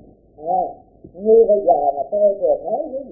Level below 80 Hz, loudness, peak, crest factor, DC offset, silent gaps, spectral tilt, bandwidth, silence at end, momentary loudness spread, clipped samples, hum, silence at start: -54 dBFS; -17 LUFS; -4 dBFS; 14 dB; under 0.1%; none; -16 dB/octave; 0.9 kHz; 0 s; 12 LU; under 0.1%; none; 0.4 s